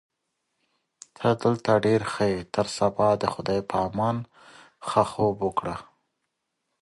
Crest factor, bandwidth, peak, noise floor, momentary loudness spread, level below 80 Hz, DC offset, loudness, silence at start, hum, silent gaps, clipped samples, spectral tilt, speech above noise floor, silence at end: 22 dB; 11.5 kHz; -6 dBFS; -80 dBFS; 10 LU; -56 dBFS; under 0.1%; -25 LUFS; 1.2 s; none; none; under 0.1%; -6 dB/octave; 55 dB; 1 s